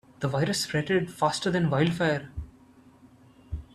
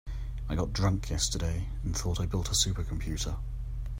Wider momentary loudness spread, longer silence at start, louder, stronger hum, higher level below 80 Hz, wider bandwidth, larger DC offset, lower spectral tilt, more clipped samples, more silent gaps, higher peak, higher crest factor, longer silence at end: first, 17 LU vs 11 LU; first, 0.2 s vs 0.05 s; first, -27 LUFS vs -32 LUFS; neither; second, -48 dBFS vs -36 dBFS; second, 13.5 kHz vs 16 kHz; neither; about the same, -5 dB/octave vs -4 dB/octave; neither; neither; about the same, -10 dBFS vs -10 dBFS; about the same, 18 dB vs 20 dB; about the same, 0.1 s vs 0 s